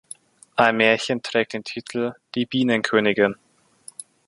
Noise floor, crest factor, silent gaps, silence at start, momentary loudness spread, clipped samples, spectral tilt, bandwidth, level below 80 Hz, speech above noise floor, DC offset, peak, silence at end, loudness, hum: -49 dBFS; 22 dB; none; 0.55 s; 21 LU; under 0.1%; -4.5 dB/octave; 11.5 kHz; -64 dBFS; 28 dB; under 0.1%; -2 dBFS; 0.95 s; -21 LUFS; none